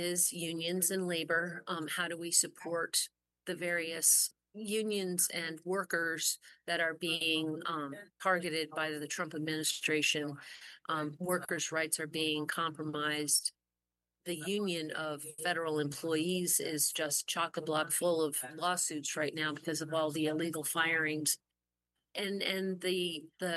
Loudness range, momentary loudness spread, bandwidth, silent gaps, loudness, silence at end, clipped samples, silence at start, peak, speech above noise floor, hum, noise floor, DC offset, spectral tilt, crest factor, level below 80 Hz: 3 LU; 9 LU; 12.5 kHz; none; -33 LUFS; 0 s; under 0.1%; 0 s; -14 dBFS; over 55 dB; none; under -90 dBFS; under 0.1%; -2 dB/octave; 22 dB; -86 dBFS